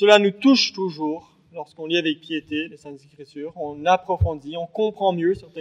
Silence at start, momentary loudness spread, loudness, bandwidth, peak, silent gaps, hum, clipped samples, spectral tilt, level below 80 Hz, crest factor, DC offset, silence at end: 0 s; 21 LU; -22 LUFS; 10 kHz; 0 dBFS; none; none; under 0.1%; -5 dB/octave; -44 dBFS; 22 dB; under 0.1%; 0 s